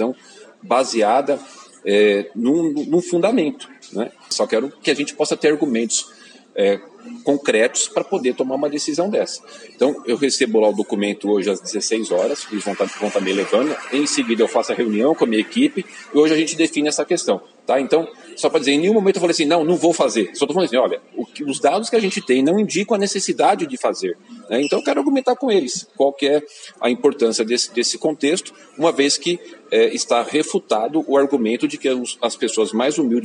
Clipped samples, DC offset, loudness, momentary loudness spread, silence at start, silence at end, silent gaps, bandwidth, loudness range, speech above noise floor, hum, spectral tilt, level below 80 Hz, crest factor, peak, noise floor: under 0.1%; under 0.1%; -19 LUFS; 8 LU; 0 s; 0 s; none; 10.5 kHz; 2 LU; 26 dB; none; -3.5 dB/octave; -78 dBFS; 16 dB; -2 dBFS; -45 dBFS